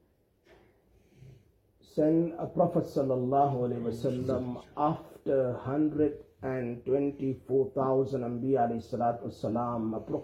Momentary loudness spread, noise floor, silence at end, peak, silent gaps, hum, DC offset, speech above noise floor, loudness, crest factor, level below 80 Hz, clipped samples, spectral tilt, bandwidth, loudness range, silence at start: 8 LU; -67 dBFS; 0 s; -12 dBFS; none; none; under 0.1%; 37 dB; -30 LUFS; 18 dB; -62 dBFS; under 0.1%; -9 dB/octave; 12.5 kHz; 2 LU; 1.25 s